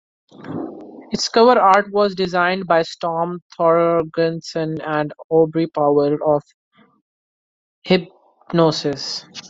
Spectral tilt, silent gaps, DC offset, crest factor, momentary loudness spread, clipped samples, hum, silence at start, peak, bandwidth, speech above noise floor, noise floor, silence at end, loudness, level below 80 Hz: -5.5 dB/octave; 3.42-3.50 s, 5.24-5.30 s, 6.54-6.71 s, 7.01-7.82 s; under 0.1%; 18 dB; 13 LU; under 0.1%; none; 0.4 s; -2 dBFS; 7.8 kHz; over 72 dB; under -90 dBFS; 0 s; -18 LUFS; -60 dBFS